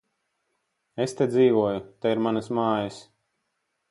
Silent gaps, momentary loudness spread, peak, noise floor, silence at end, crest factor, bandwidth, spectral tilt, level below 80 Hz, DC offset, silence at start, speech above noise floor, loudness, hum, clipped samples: none; 10 LU; -10 dBFS; -77 dBFS; 0.9 s; 18 dB; 11.5 kHz; -6.5 dB/octave; -66 dBFS; under 0.1%; 0.95 s; 54 dB; -25 LUFS; none; under 0.1%